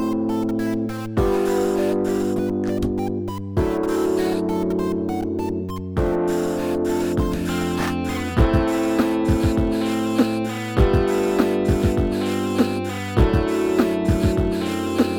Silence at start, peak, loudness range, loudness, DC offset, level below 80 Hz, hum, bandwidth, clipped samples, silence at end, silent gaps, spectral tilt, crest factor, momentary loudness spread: 0 s; -2 dBFS; 3 LU; -21 LUFS; under 0.1%; -30 dBFS; none; over 20 kHz; under 0.1%; 0 s; none; -7 dB/octave; 18 dB; 5 LU